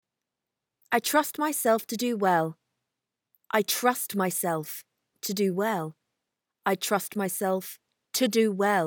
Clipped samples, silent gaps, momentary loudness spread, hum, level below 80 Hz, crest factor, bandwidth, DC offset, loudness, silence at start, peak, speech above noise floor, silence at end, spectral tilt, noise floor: under 0.1%; none; 9 LU; none; -84 dBFS; 20 dB; 19.5 kHz; under 0.1%; -27 LUFS; 0.9 s; -8 dBFS; 60 dB; 0 s; -3.5 dB/octave; -87 dBFS